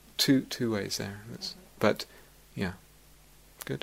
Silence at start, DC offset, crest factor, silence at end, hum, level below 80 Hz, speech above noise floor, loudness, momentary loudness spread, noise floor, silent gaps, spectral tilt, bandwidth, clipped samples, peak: 0.2 s; under 0.1%; 24 dB; 0.05 s; none; -60 dBFS; 27 dB; -31 LUFS; 18 LU; -57 dBFS; none; -4 dB/octave; 16 kHz; under 0.1%; -8 dBFS